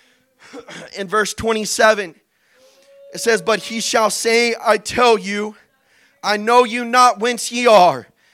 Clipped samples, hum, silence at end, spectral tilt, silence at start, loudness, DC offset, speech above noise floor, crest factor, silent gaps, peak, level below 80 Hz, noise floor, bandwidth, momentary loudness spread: under 0.1%; none; 0.3 s; -2.5 dB/octave; 0.55 s; -16 LUFS; under 0.1%; 40 dB; 16 dB; none; 0 dBFS; -54 dBFS; -57 dBFS; 16 kHz; 17 LU